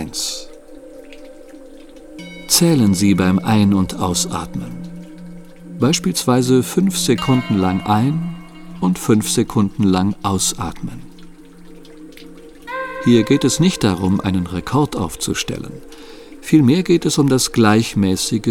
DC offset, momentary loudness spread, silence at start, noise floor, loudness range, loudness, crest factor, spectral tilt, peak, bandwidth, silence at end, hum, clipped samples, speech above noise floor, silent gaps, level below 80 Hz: under 0.1%; 20 LU; 0 s; -39 dBFS; 3 LU; -16 LUFS; 18 dB; -5 dB/octave; 0 dBFS; 17.5 kHz; 0 s; none; under 0.1%; 23 dB; none; -42 dBFS